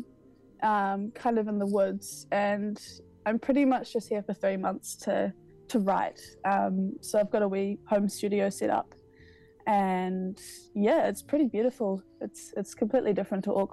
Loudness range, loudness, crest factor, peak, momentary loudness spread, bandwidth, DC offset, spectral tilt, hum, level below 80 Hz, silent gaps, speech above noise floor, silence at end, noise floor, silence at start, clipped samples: 1 LU; -29 LUFS; 16 dB; -12 dBFS; 11 LU; 12.5 kHz; under 0.1%; -6 dB/octave; none; -66 dBFS; none; 29 dB; 0.05 s; -57 dBFS; 0 s; under 0.1%